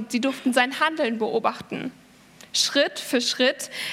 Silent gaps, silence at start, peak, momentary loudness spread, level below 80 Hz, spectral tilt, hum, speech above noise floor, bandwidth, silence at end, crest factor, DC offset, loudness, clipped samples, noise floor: none; 0 s; -4 dBFS; 11 LU; -70 dBFS; -2 dB/octave; none; 26 dB; 16.5 kHz; 0 s; 20 dB; under 0.1%; -23 LUFS; under 0.1%; -50 dBFS